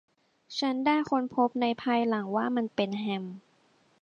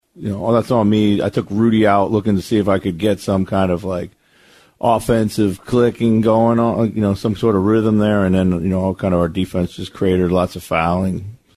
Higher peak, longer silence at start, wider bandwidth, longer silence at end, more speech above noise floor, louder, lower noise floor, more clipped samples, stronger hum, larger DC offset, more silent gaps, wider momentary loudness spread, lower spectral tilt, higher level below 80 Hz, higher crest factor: second, -12 dBFS vs -2 dBFS; first, 0.5 s vs 0.2 s; second, 8.8 kHz vs 14.5 kHz; first, 0.65 s vs 0.2 s; about the same, 38 dB vs 35 dB; second, -29 LUFS vs -17 LUFS; first, -66 dBFS vs -51 dBFS; neither; neither; neither; neither; about the same, 9 LU vs 7 LU; second, -6 dB/octave vs -7.5 dB/octave; second, -74 dBFS vs -44 dBFS; about the same, 18 dB vs 14 dB